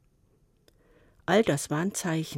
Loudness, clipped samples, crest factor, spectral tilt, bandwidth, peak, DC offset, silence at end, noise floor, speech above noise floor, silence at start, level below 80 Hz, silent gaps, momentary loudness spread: -27 LUFS; under 0.1%; 18 dB; -5 dB/octave; 16.5 kHz; -12 dBFS; under 0.1%; 0 s; -65 dBFS; 39 dB; 1.3 s; -64 dBFS; none; 6 LU